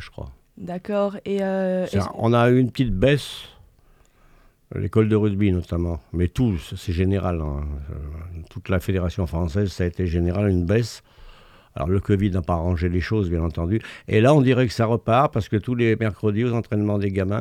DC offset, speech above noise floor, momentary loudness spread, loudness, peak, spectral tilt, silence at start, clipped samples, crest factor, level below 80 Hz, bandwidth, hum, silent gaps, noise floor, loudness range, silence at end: under 0.1%; 34 dB; 15 LU; -22 LUFS; -4 dBFS; -7.5 dB/octave; 0 s; under 0.1%; 18 dB; -40 dBFS; 14 kHz; none; none; -55 dBFS; 5 LU; 0 s